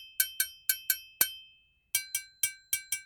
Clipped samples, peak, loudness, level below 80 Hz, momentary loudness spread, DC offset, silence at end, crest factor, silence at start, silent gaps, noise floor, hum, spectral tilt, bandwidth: under 0.1%; -8 dBFS; -31 LUFS; -70 dBFS; 5 LU; under 0.1%; 0 s; 26 dB; 0 s; none; -63 dBFS; none; 3 dB/octave; 19.5 kHz